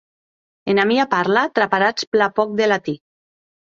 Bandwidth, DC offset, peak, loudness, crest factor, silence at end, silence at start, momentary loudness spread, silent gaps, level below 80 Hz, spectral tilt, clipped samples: 7.6 kHz; under 0.1%; -2 dBFS; -18 LUFS; 18 dB; 0.8 s; 0.65 s; 8 LU; 2.07-2.12 s; -64 dBFS; -5 dB/octave; under 0.1%